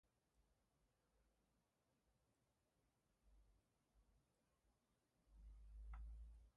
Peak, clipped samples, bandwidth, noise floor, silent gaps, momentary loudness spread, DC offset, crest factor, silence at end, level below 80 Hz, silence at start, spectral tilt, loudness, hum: -46 dBFS; under 0.1%; 3.6 kHz; -87 dBFS; none; 8 LU; under 0.1%; 20 dB; 0.05 s; -66 dBFS; 0.05 s; -6.5 dB/octave; -63 LUFS; none